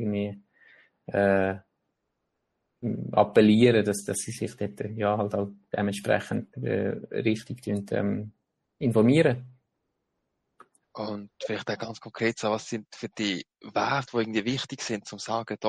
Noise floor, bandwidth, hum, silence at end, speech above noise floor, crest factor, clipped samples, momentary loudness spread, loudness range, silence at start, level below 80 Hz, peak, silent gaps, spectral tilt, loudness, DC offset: -80 dBFS; 12 kHz; none; 0 s; 53 dB; 22 dB; under 0.1%; 15 LU; 7 LU; 0 s; -66 dBFS; -6 dBFS; none; -5.5 dB/octave; -27 LUFS; under 0.1%